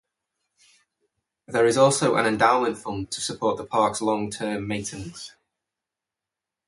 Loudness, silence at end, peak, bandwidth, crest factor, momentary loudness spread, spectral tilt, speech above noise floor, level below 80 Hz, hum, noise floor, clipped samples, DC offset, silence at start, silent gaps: -23 LUFS; 1.4 s; -4 dBFS; 11.5 kHz; 22 dB; 15 LU; -4 dB/octave; 65 dB; -58 dBFS; none; -88 dBFS; under 0.1%; under 0.1%; 1.5 s; none